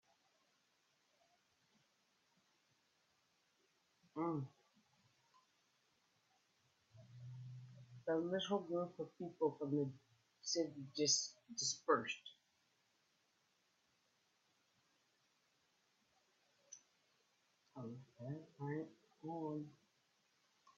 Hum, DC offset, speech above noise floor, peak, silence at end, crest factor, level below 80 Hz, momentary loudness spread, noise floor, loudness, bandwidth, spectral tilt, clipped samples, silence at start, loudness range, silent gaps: none; under 0.1%; 39 dB; -22 dBFS; 1.05 s; 26 dB; under -90 dBFS; 21 LU; -81 dBFS; -43 LUFS; 7.4 kHz; -4 dB/octave; under 0.1%; 4.15 s; 17 LU; none